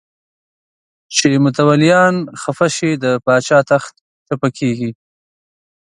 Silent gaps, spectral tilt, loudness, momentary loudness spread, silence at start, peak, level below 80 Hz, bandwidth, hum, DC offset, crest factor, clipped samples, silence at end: 4.01-4.26 s; -5 dB/octave; -14 LUFS; 12 LU; 1.1 s; 0 dBFS; -58 dBFS; 11.5 kHz; none; under 0.1%; 16 dB; under 0.1%; 1.05 s